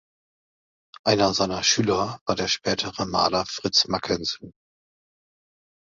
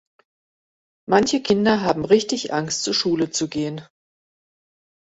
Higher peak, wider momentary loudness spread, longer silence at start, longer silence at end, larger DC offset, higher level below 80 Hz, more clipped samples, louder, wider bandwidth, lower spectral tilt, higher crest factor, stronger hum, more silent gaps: second, -6 dBFS vs -2 dBFS; second, 6 LU vs 9 LU; about the same, 1.05 s vs 1.1 s; first, 1.45 s vs 1.2 s; neither; about the same, -54 dBFS vs -56 dBFS; neither; second, -23 LUFS vs -20 LUFS; about the same, 7.8 kHz vs 8.2 kHz; about the same, -3 dB/octave vs -4 dB/octave; about the same, 20 dB vs 20 dB; neither; first, 2.21-2.26 s vs none